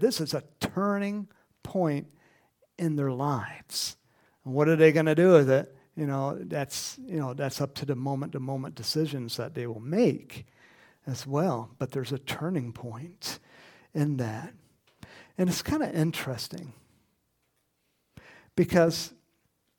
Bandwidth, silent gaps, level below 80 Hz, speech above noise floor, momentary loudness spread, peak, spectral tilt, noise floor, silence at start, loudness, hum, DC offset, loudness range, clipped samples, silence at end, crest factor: 19 kHz; none; -62 dBFS; 47 dB; 17 LU; -6 dBFS; -5.5 dB/octave; -75 dBFS; 0 s; -28 LUFS; none; under 0.1%; 9 LU; under 0.1%; 0.7 s; 24 dB